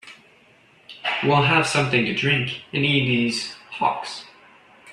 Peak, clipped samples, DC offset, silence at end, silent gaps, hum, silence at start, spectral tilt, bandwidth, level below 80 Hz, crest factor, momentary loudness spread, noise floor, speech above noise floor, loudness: -4 dBFS; under 0.1%; under 0.1%; 0 s; none; none; 0.05 s; -4.5 dB/octave; 12 kHz; -60 dBFS; 18 dB; 12 LU; -55 dBFS; 34 dB; -21 LUFS